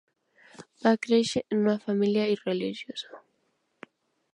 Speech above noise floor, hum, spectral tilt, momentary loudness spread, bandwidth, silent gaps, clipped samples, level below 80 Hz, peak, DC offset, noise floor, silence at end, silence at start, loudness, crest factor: 48 dB; none; -5.5 dB/octave; 13 LU; 11 kHz; none; under 0.1%; -72 dBFS; -8 dBFS; under 0.1%; -74 dBFS; 1.2 s; 0.6 s; -27 LUFS; 20 dB